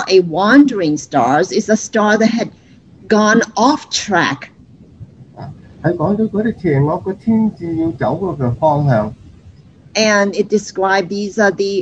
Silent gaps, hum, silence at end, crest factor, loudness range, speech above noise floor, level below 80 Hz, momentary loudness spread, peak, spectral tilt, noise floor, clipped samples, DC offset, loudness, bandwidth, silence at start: none; none; 0 s; 16 dB; 4 LU; 28 dB; -48 dBFS; 9 LU; 0 dBFS; -5 dB/octave; -42 dBFS; under 0.1%; under 0.1%; -15 LUFS; 8.2 kHz; 0 s